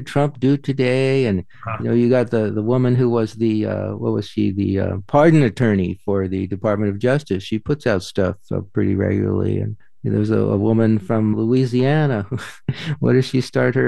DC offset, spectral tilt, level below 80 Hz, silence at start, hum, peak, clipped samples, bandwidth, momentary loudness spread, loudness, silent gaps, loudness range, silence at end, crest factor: 0.9%; -8 dB/octave; -52 dBFS; 0 s; none; -2 dBFS; under 0.1%; 12 kHz; 8 LU; -19 LUFS; none; 3 LU; 0 s; 16 dB